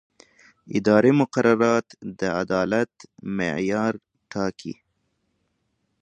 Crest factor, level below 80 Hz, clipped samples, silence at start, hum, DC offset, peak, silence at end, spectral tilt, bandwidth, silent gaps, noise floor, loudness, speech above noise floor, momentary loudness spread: 22 dB; -60 dBFS; under 0.1%; 0.65 s; none; under 0.1%; -2 dBFS; 1.3 s; -6.5 dB/octave; 9.8 kHz; none; -73 dBFS; -23 LUFS; 51 dB; 19 LU